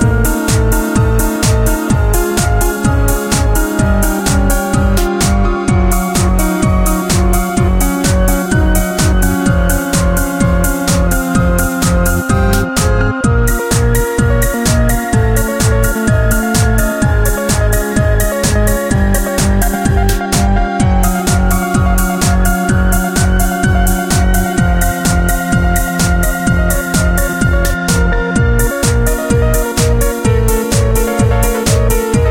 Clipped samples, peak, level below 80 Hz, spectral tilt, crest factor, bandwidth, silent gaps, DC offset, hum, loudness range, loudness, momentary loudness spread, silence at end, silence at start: under 0.1%; 0 dBFS; -16 dBFS; -5 dB/octave; 12 dB; 17 kHz; none; under 0.1%; none; 0 LU; -13 LUFS; 1 LU; 0 s; 0 s